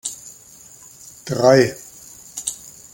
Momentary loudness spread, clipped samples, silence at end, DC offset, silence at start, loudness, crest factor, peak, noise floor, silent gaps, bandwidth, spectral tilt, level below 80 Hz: 27 LU; under 0.1%; 0.4 s; under 0.1%; 0.05 s; -18 LUFS; 20 dB; -2 dBFS; -45 dBFS; none; 17 kHz; -4.5 dB/octave; -58 dBFS